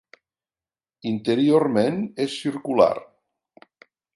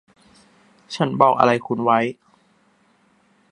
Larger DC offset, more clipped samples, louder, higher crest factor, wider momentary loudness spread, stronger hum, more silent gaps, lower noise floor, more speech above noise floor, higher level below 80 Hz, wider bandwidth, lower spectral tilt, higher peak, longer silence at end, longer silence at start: neither; neither; second, -22 LUFS vs -19 LUFS; about the same, 20 dB vs 22 dB; about the same, 11 LU vs 11 LU; neither; neither; first, under -90 dBFS vs -60 dBFS; first, over 69 dB vs 42 dB; about the same, -66 dBFS vs -68 dBFS; about the same, 11.5 kHz vs 10.5 kHz; about the same, -6.5 dB/octave vs -6.5 dB/octave; second, -4 dBFS vs 0 dBFS; second, 1.1 s vs 1.4 s; first, 1.05 s vs 0.9 s